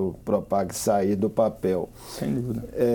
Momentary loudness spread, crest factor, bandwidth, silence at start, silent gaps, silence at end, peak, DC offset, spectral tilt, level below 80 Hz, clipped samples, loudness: 7 LU; 16 dB; 19.5 kHz; 0 s; none; 0 s; -8 dBFS; under 0.1%; -6.5 dB/octave; -50 dBFS; under 0.1%; -26 LUFS